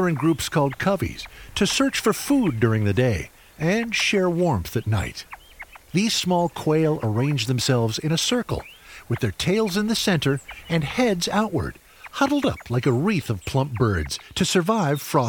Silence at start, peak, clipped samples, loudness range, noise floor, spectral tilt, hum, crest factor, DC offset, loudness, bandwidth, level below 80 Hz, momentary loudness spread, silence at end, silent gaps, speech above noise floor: 0 s; -6 dBFS; under 0.1%; 2 LU; -44 dBFS; -5 dB/octave; none; 18 dB; under 0.1%; -22 LUFS; over 20 kHz; -44 dBFS; 10 LU; 0 s; none; 22 dB